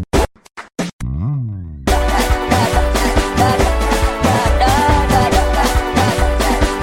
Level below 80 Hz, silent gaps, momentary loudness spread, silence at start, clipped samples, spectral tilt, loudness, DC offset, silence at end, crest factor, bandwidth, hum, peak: -20 dBFS; 0.93-0.99 s; 10 LU; 0 s; under 0.1%; -5 dB/octave; -15 LUFS; 0.4%; 0 s; 14 dB; 17 kHz; none; -2 dBFS